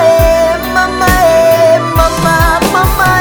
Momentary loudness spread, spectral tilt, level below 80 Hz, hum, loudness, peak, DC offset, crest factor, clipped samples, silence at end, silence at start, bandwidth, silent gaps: 4 LU; -4.5 dB/octave; -20 dBFS; none; -9 LUFS; 0 dBFS; under 0.1%; 8 dB; 0.3%; 0 s; 0 s; over 20 kHz; none